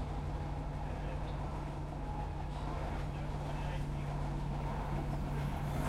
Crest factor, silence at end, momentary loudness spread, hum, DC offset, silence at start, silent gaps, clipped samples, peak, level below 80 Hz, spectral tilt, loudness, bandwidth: 14 dB; 0 s; 3 LU; none; under 0.1%; 0 s; none; under 0.1%; -24 dBFS; -42 dBFS; -7.5 dB/octave; -40 LUFS; 13 kHz